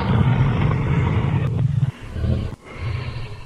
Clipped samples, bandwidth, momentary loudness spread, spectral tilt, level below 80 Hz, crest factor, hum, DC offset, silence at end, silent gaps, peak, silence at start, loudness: under 0.1%; 7.6 kHz; 10 LU; -8.5 dB/octave; -32 dBFS; 16 dB; none; under 0.1%; 0 s; none; -4 dBFS; 0 s; -21 LUFS